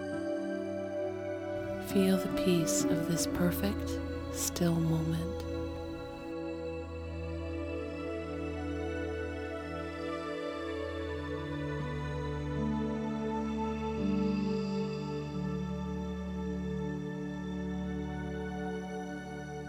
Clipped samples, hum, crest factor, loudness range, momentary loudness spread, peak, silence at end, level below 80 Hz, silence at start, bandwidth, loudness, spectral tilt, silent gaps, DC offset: under 0.1%; none; 20 dB; 7 LU; 9 LU; -16 dBFS; 0 s; -48 dBFS; 0 s; 19 kHz; -35 LUFS; -5.5 dB/octave; none; under 0.1%